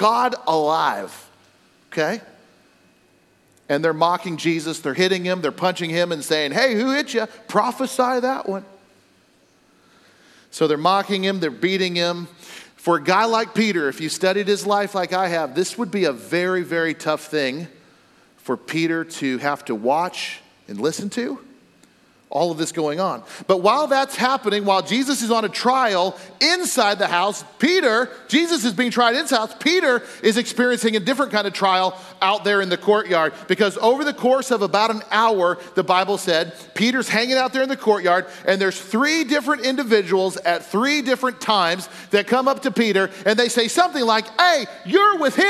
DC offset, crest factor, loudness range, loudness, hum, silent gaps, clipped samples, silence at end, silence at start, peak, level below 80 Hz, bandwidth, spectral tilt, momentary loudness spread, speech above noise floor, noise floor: under 0.1%; 18 dB; 6 LU; -20 LUFS; none; none; under 0.1%; 0 s; 0 s; -4 dBFS; -76 dBFS; 15 kHz; -3.5 dB/octave; 8 LU; 38 dB; -58 dBFS